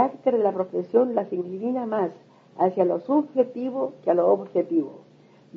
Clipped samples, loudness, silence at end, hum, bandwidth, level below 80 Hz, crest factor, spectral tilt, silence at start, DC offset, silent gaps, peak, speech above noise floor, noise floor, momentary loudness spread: under 0.1%; -24 LUFS; 0.55 s; none; 5.6 kHz; -78 dBFS; 18 dB; -10 dB/octave; 0 s; under 0.1%; none; -6 dBFS; 25 dB; -49 dBFS; 7 LU